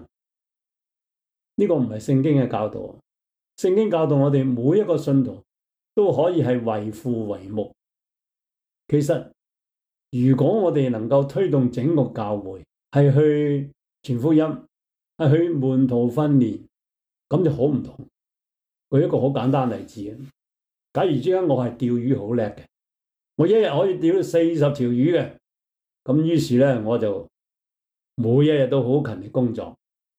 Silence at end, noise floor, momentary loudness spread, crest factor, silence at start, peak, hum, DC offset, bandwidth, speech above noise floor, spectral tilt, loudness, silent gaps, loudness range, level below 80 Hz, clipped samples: 0.45 s; -87 dBFS; 13 LU; 16 dB; 0 s; -6 dBFS; none; under 0.1%; 11 kHz; 67 dB; -8.5 dB/octave; -21 LUFS; none; 4 LU; -62 dBFS; under 0.1%